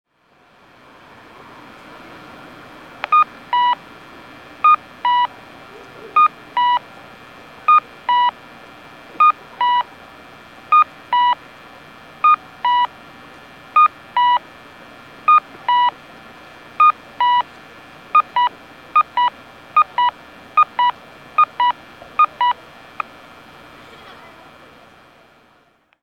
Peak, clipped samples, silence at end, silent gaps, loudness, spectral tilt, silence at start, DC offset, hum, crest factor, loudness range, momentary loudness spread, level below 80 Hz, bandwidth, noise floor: 0 dBFS; under 0.1%; 3.5 s; none; -17 LUFS; -3 dB/octave; 3.1 s; under 0.1%; none; 20 dB; 4 LU; 24 LU; -64 dBFS; 8.8 kHz; -57 dBFS